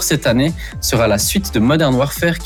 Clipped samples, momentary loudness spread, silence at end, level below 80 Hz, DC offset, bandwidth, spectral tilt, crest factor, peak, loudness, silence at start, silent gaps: under 0.1%; 4 LU; 0 s; -30 dBFS; under 0.1%; over 20 kHz; -4.5 dB/octave; 12 dB; -4 dBFS; -15 LUFS; 0 s; none